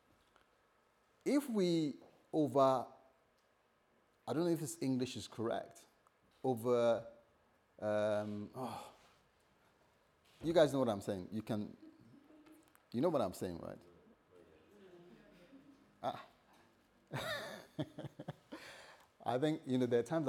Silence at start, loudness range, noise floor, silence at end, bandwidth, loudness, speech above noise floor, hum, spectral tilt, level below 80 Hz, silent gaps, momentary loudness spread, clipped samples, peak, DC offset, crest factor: 1.25 s; 10 LU; -75 dBFS; 0 s; 19 kHz; -38 LUFS; 38 dB; none; -6 dB/octave; -78 dBFS; none; 19 LU; under 0.1%; -18 dBFS; under 0.1%; 22 dB